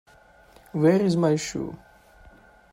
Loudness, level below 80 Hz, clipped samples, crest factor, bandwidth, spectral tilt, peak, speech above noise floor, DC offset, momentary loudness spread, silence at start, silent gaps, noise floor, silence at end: -23 LUFS; -58 dBFS; under 0.1%; 18 dB; 16 kHz; -6.5 dB/octave; -8 dBFS; 32 dB; under 0.1%; 16 LU; 0.75 s; none; -54 dBFS; 0.95 s